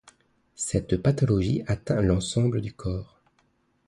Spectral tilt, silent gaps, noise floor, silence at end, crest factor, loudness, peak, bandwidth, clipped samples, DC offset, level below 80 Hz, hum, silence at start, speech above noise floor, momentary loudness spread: -6.5 dB/octave; none; -68 dBFS; 0.85 s; 18 dB; -26 LUFS; -8 dBFS; 11.5 kHz; under 0.1%; under 0.1%; -42 dBFS; none; 0.6 s; 43 dB; 10 LU